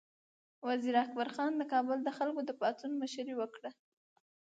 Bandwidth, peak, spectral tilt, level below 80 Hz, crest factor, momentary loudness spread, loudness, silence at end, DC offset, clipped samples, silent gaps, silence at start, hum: 9 kHz; -18 dBFS; -4 dB/octave; under -90 dBFS; 20 dB; 9 LU; -36 LUFS; 0.7 s; under 0.1%; under 0.1%; none; 0.6 s; none